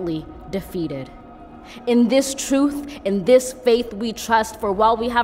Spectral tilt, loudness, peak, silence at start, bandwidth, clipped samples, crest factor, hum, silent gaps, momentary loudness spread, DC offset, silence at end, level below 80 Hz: -4.5 dB/octave; -20 LUFS; -2 dBFS; 0 s; 16 kHz; under 0.1%; 18 dB; none; none; 14 LU; under 0.1%; 0 s; -46 dBFS